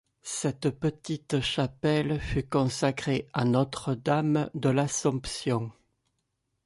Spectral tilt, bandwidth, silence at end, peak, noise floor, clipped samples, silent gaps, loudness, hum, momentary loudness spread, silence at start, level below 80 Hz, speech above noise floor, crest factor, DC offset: -5.5 dB/octave; 11.5 kHz; 0.95 s; -12 dBFS; -79 dBFS; under 0.1%; none; -28 LUFS; none; 6 LU; 0.25 s; -50 dBFS; 51 dB; 16 dB; under 0.1%